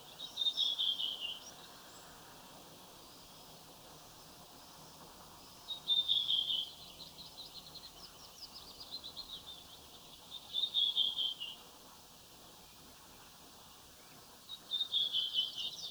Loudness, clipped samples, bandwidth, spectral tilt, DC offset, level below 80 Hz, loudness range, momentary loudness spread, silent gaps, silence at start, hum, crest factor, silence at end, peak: -34 LUFS; under 0.1%; over 20 kHz; -0.5 dB/octave; under 0.1%; -72 dBFS; 17 LU; 23 LU; none; 0 s; none; 22 dB; 0 s; -20 dBFS